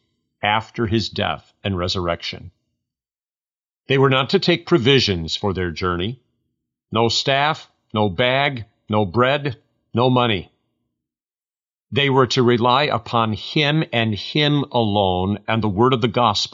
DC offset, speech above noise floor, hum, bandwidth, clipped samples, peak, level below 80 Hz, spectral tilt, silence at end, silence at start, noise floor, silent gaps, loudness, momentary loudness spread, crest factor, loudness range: under 0.1%; over 71 dB; none; 7.6 kHz; under 0.1%; -4 dBFS; -50 dBFS; -5.5 dB/octave; 0.05 s; 0.45 s; under -90 dBFS; 3.51-3.56 s, 3.70-3.80 s, 11.72-11.77 s; -19 LUFS; 9 LU; 18 dB; 4 LU